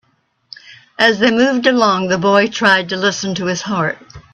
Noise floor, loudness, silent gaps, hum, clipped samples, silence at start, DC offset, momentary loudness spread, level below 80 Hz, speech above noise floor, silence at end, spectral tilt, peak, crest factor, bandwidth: -62 dBFS; -14 LUFS; none; none; under 0.1%; 0.7 s; under 0.1%; 7 LU; -54 dBFS; 47 dB; 0.15 s; -4 dB/octave; 0 dBFS; 16 dB; 10 kHz